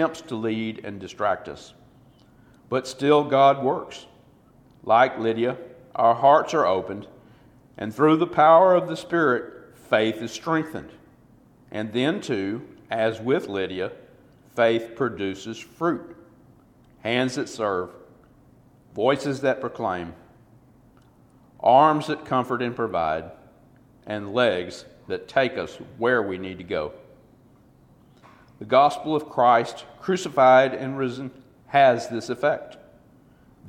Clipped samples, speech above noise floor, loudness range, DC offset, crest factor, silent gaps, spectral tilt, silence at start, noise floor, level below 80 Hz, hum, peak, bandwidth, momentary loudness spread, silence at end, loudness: under 0.1%; 33 dB; 7 LU; under 0.1%; 20 dB; none; -5.5 dB/octave; 0 s; -55 dBFS; -62 dBFS; none; -4 dBFS; 13 kHz; 18 LU; 0 s; -23 LUFS